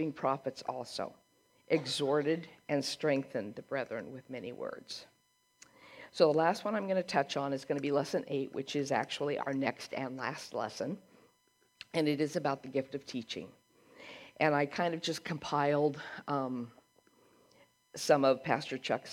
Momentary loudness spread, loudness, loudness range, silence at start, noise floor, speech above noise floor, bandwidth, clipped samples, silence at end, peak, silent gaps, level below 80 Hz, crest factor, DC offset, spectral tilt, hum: 14 LU; -34 LUFS; 5 LU; 0 s; -72 dBFS; 39 dB; 16 kHz; under 0.1%; 0 s; -12 dBFS; none; -80 dBFS; 22 dB; under 0.1%; -5 dB/octave; none